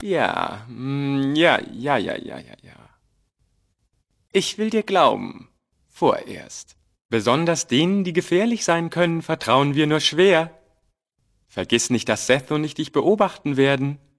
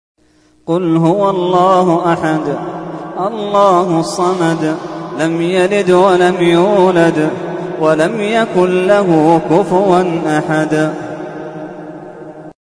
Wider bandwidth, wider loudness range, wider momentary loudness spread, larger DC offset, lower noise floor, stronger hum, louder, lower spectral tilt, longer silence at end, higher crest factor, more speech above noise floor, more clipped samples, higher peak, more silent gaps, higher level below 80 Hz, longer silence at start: about the same, 11 kHz vs 11 kHz; about the same, 5 LU vs 3 LU; about the same, 14 LU vs 15 LU; neither; first, -69 dBFS vs -51 dBFS; neither; second, -20 LUFS vs -12 LUFS; second, -4.5 dB/octave vs -6.5 dB/octave; about the same, 0.25 s vs 0.15 s; first, 20 dB vs 12 dB; first, 49 dB vs 40 dB; neither; about the same, 0 dBFS vs 0 dBFS; first, 7.05-7.09 s vs none; second, -60 dBFS vs -52 dBFS; second, 0 s vs 0.65 s